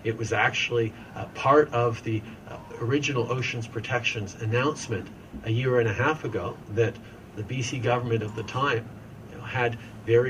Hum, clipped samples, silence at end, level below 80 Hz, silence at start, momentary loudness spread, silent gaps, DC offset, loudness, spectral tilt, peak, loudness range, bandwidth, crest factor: none; under 0.1%; 0 s; -56 dBFS; 0 s; 16 LU; none; under 0.1%; -27 LUFS; -5.5 dB/octave; -6 dBFS; 3 LU; 10 kHz; 20 dB